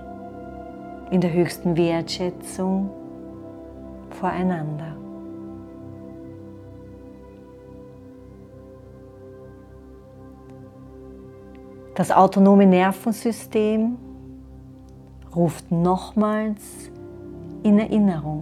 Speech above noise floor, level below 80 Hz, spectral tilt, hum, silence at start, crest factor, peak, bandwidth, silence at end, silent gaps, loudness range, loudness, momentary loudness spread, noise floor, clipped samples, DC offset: 24 dB; -50 dBFS; -7 dB/octave; none; 0 s; 22 dB; -2 dBFS; 14 kHz; 0 s; none; 24 LU; -21 LUFS; 26 LU; -44 dBFS; under 0.1%; under 0.1%